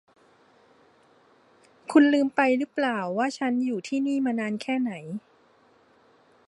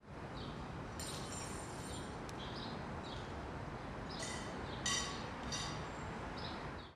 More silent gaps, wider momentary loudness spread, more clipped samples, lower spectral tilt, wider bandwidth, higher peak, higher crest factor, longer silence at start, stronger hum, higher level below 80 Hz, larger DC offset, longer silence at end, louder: neither; first, 13 LU vs 8 LU; neither; first, -5.5 dB/octave vs -3.5 dB/octave; second, 11 kHz vs 14 kHz; first, -6 dBFS vs -24 dBFS; about the same, 20 dB vs 20 dB; first, 1.9 s vs 0 s; neither; second, -80 dBFS vs -56 dBFS; neither; first, 1.3 s vs 0 s; first, -25 LUFS vs -44 LUFS